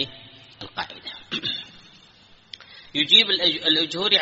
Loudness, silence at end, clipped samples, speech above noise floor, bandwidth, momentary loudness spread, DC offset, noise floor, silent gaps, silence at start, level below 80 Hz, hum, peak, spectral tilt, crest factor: -19 LUFS; 0 s; under 0.1%; 30 dB; 8 kHz; 23 LU; under 0.1%; -53 dBFS; none; 0 s; -64 dBFS; none; -2 dBFS; 0.5 dB/octave; 22 dB